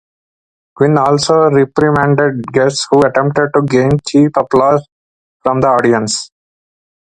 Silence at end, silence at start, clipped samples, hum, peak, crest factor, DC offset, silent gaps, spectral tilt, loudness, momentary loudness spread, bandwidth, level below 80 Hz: 0.95 s; 0.8 s; under 0.1%; none; 0 dBFS; 12 dB; under 0.1%; 4.92-5.40 s; -5.5 dB/octave; -12 LUFS; 6 LU; 9.4 kHz; -46 dBFS